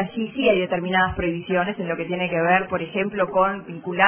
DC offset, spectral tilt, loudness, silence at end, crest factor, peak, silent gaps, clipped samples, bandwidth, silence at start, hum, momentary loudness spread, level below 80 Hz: under 0.1%; -9.5 dB/octave; -22 LUFS; 0 s; 20 dB; -2 dBFS; none; under 0.1%; 3.5 kHz; 0 s; none; 7 LU; -48 dBFS